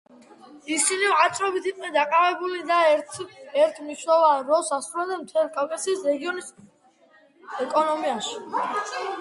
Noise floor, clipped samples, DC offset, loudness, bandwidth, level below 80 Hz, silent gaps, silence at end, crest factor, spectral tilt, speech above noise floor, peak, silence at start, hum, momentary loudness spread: -58 dBFS; under 0.1%; under 0.1%; -23 LUFS; 11.5 kHz; -76 dBFS; none; 0 s; 18 dB; -1.5 dB/octave; 34 dB; -6 dBFS; 0.5 s; none; 12 LU